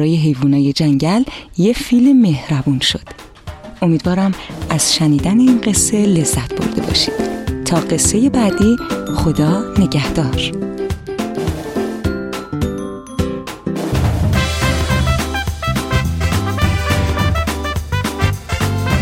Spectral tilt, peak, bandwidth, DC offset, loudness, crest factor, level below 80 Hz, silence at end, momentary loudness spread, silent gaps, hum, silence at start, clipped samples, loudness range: -5 dB/octave; -2 dBFS; 16.5 kHz; under 0.1%; -16 LUFS; 14 dB; -28 dBFS; 0 s; 10 LU; none; none; 0 s; under 0.1%; 6 LU